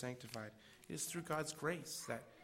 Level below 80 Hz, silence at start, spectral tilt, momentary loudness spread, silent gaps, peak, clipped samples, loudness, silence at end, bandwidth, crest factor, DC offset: -76 dBFS; 0 s; -3.5 dB/octave; 9 LU; none; -26 dBFS; under 0.1%; -45 LUFS; 0 s; 16 kHz; 20 dB; under 0.1%